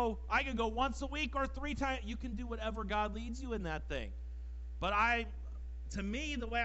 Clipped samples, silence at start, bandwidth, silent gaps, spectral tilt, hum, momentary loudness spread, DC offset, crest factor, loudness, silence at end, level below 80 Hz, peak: under 0.1%; 0 s; 8.2 kHz; none; -5 dB/octave; none; 14 LU; under 0.1%; 18 dB; -38 LUFS; 0 s; -44 dBFS; -20 dBFS